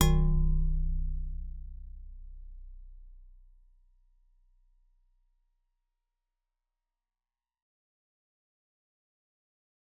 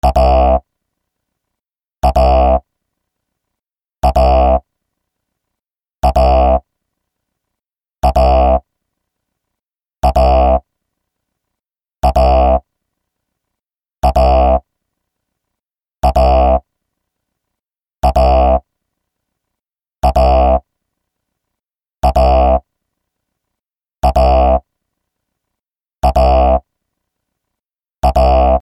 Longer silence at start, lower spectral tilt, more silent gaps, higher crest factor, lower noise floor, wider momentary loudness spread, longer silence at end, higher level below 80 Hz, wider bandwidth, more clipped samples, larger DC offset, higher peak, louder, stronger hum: about the same, 0 s vs 0.05 s; about the same, -8 dB/octave vs -7.5 dB/octave; neither; first, 28 dB vs 14 dB; first, under -90 dBFS vs -83 dBFS; first, 25 LU vs 7 LU; first, 6.9 s vs 0.05 s; second, -36 dBFS vs -20 dBFS; second, 3.9 kHz vs 12 kHz; neither; neither; second, -8 dBFS vs 0 dBFS; second, -33 LUFS vs -13 LUFS; neither